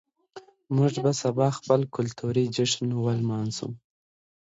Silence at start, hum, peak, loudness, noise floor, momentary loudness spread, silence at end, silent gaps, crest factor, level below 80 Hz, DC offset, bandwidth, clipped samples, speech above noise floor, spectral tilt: 0.35 s; none; -8 dBFS; -26 LUFS; -49 dBFS; 8 LU; 0.75 s; none; 20 dB; -64 dBFS; under 0.1%; 8 kHz; under 0.1%; 24 dB; -6 dB/octave